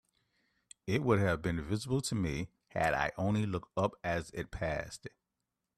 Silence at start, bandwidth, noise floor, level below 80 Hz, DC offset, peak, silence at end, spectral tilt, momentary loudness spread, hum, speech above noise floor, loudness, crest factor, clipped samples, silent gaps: 0.85 s; 13.5 kHz; -87 dBFS; -54 dBFS; under 0.1%; -14 dBFS; 0.7 s; -6 dB/octave; 12 LU; none; 54 dB; -34 LUFS; 20 dB; under 0.1%; none